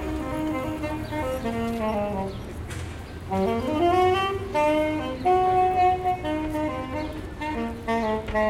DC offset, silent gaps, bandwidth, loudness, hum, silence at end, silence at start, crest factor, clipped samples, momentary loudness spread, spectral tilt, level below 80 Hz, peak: under 0.1%; none; 16 kHz; -25 LUFS; none; 0 s; 0 s; 14 dB; under 0.1%; 12 LU; -6.5 dB/octave; -40 dBFS; -10 dBFS